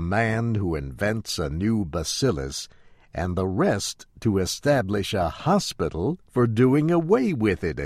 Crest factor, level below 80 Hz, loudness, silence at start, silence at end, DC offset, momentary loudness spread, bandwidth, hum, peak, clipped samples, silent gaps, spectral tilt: 16 dB; -44 dBFS; -24 LUFS; 0 s; 0 s; under 0.1%; 8 LU; 15.5 kHz; none; -6 dBFS; under 0.1%; none; -5.5 dB/octave